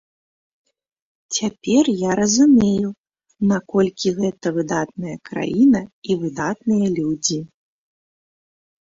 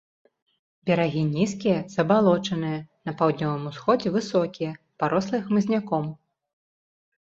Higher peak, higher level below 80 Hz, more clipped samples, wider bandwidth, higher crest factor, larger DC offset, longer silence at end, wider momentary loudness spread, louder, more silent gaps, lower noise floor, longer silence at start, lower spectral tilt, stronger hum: about the same, -4 dBFS vs -6 dBFS; first, -56 dBFS vs -64 dBFS; neither; about the same, 7.8 kHz vs 7.8 kHz; about the same, 16 dB vs 18 dB; neither; first, 1.35 s vs 1.15 s; about the same, 10 LU vs 10 LU; first, -19 LUFS vs -25 LUFS; first, 2.98-3.04 s, 5.93-6.02 s vs none; about the same, under -90 dBFS vs under -90 dBFS; first, 1.3 s vs 0.85 s; second, -5 dB/octave vs -7 dB/octave; neither